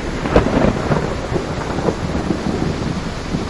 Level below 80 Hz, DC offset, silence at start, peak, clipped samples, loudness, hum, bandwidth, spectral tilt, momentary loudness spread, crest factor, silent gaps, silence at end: -28 dBFS; 0.6%; 0 s; 0 dBFS; under 0.1%; -19 LUFS; none; 11.5 kHz; -6.5 dB/octave; 6 LU; 18 dB; none; 0 s